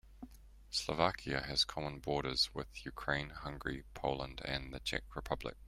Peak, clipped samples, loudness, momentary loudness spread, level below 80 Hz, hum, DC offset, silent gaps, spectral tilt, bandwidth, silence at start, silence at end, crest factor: -14 dBFS; under 0.1%; -38 LUFS; 11 LU; -54 dBFS; none; under 0.1%; none; -3.5 dB/octave; 16 kHz; 0.05 s; 0 s; 24 dB